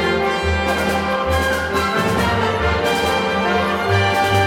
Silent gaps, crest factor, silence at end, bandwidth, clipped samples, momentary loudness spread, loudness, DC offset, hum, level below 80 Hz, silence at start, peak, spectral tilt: none; 12 dB; 0 s; 18.5 kHz; under 0.1%; 2 LU; -18 LUFS; under 0.1%; none; -32 dBFS; 0 s; -6 dBFS; -5 dB/octave